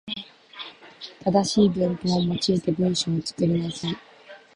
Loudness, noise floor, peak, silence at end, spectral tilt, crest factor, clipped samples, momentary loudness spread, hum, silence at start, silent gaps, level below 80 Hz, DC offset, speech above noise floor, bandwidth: -24 LUFS; -44 dBFS; -6 dBFS; 0.2 s; -6 dB/octave; 18 dB; under 0.1%; 18 LU; none; 0.05 s; none; -56 dBFS; under 0.1%; 22 dB; 11 kHz